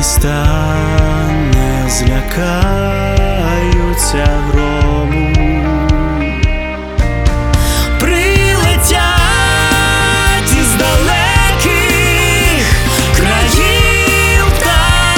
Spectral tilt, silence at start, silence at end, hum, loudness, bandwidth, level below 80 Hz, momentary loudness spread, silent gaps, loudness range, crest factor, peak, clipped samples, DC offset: -4 dB/octave; 0 s; 0 s; none; -11 LUFS; 19.5 kHz; -16 dBFS; 5 LU; none; 4 LU; 10 dB; 0 dBFS; under 0.1%; under 0.1%